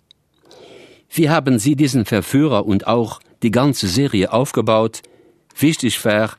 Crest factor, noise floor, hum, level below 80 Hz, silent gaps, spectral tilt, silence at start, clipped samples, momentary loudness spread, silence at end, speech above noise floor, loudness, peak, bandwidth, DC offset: 16 dB; -54 dBFS; none; -52 dBFS; none; -5.5 dB/octave; 1.1 s; under 0.1%; 7 LU; 0.05 s; 38 dB; -17 LUFS; 0 dBFS; 14 kHz; under 0.1%